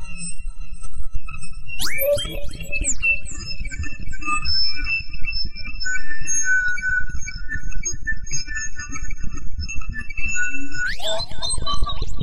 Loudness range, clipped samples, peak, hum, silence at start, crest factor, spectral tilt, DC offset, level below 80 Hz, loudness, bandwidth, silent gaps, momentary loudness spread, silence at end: 5 LU; under 0.1%; -6 dBFS; none; 0 s; 10 dB; -1.5 dB/octave; under 0.1%; -30 dBFS; -24 LUFS; 13.5 kHz; none; 15 LU; 0 s